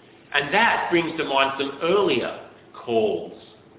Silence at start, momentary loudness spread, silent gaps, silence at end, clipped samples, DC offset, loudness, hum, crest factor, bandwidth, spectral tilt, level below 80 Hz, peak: 0.3 s; 13 LU; none; 0.35 s; under 0.1%; under 0.1%; -22 LUFS; none; 20 dB; 4 kHz; -8.5 dB/octave; -60 dBFS; -4 dBFS